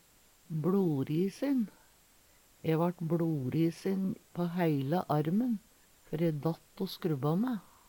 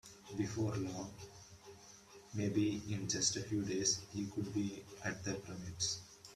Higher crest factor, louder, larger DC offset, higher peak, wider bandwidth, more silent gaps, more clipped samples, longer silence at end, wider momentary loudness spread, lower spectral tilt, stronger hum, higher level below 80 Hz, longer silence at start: about the same, 16 dB vs 20 dB; first, -33 LUFS vs -39 LUFS; neither; about the same, -18 dBFS vs -20 dBFS; first, 18.5 kHz vs 14 kHz; neither; neither; first, 0.3 s vs 0 s; second, 8 LU vs 21 LU; first, -8 dB/octave vs -3.5 dB/octave; neither; about the same, -68 dBFS vs -68 dBFS; first, 0.5 s vs 0.05 s